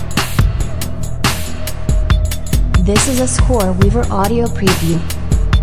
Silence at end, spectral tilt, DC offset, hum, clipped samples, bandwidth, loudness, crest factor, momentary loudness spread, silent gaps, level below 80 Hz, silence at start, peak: 0 s; -5 dB/octave; under 0.1%; none; under 0.1%; 16 kHz; -16 LUFS; 14 dB; 8 LU; none; -18 dBFS; 0 s; 0 dBFS